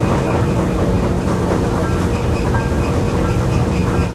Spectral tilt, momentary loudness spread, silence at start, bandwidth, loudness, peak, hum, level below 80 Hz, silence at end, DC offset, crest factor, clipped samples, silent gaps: -7 dB/octave; 1 LU; 0 s; 14 kHz; -17 LUFS; -4 dBFS; none; -24 dBFS; 0 s; under 0.1%; 12 dB; under 0.1%; none